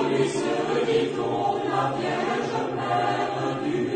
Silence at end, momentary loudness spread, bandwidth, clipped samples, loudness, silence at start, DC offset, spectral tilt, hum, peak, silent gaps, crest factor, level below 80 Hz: 0 s; 3 LU; 9.4 kHz; under 0.1%; -25 LUFS; 0 s; under 0.1%; -5.5 dB/octave; none; -10 dBFS; none; 14 dB; -64 dBFS